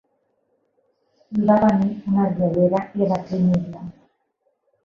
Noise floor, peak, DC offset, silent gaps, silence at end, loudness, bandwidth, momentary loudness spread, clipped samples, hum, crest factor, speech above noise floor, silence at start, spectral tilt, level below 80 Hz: -70 dBFS; -4 dBFS; under 0.1%; none; 0.95 s; -20 LUFS; 6.8 kHz; 13 LU; under 0.1%; none; 18 dB; 51 dB; 1.3 s; -10 dB/octave; -54 dBFS